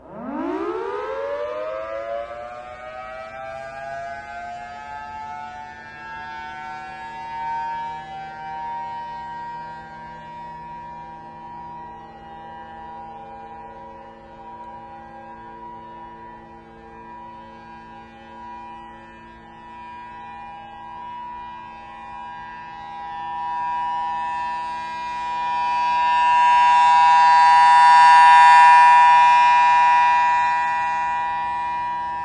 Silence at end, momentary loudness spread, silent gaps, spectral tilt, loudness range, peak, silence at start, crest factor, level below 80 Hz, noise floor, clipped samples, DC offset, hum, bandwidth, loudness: 0 s; 26 LU; none; -2.5 dB/octave; 27 LU; -2 dBFS; 0.1 s; 18 dB; -56 dBFS; -42 dBFS; under 0.1%; under 0.1%; none; 10.5 kHz; -16 LUFS